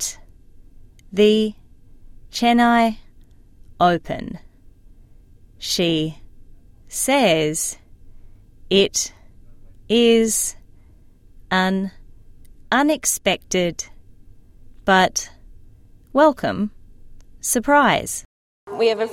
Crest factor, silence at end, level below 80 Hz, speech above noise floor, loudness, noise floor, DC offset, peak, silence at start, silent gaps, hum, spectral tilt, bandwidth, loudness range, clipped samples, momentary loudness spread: 18 dB; 0 s; -46 dBFS; 30 dB; -19 LUFS; -48 dBFS; under 0.1%; -4 dBFS; 0 s; 18.25-18.67 s; none; -3.5 dB/octave; 16.5 kHz; 3 LU; under 0.1%; 15 LU